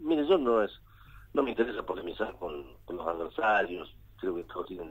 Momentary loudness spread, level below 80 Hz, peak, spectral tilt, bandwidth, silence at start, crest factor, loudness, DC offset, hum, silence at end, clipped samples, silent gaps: 14 LU; -56 dBFS; -12 dBFS; -6.5 dB/octave; 16 kHz; 0 s; 18 dB; -31 LUFS; under 0.1%; none; 0 s; under 0.1%; none